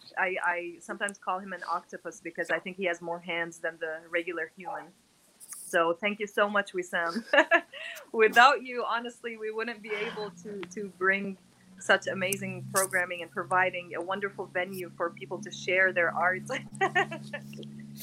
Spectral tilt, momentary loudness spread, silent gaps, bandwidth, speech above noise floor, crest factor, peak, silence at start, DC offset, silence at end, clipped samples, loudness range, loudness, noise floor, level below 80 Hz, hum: -3 dB/octave; 15 LU; none; 16.5 kHz; 21 dB; 26 dB; -4 dBFS; 0.05 s; under 0.1%; 0 s; under 0.1%; 8 LU; -29 LUFS; -51 dBFS; -76 dBFS; none